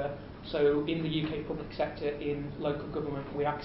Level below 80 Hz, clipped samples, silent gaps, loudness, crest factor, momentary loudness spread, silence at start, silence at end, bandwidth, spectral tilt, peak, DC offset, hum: -52 dBFS; under 0.1%; none; -33 LUFS; 16 dB; 9 LU; 0 s; 0 s; 5.6 kHz; -5 dB/octave; -16 dBFS; under 0.1%; none